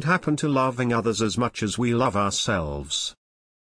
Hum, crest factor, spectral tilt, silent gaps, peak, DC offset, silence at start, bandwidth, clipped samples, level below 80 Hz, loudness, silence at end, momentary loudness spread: none; 16 dB; -4.5 dB/octave; none; -8 dBFS; under 0.1%; 0 s; 10.5 kHz; under 0.1%; -46 dBFS; -24 LUFS; 0.55 s; 5 LU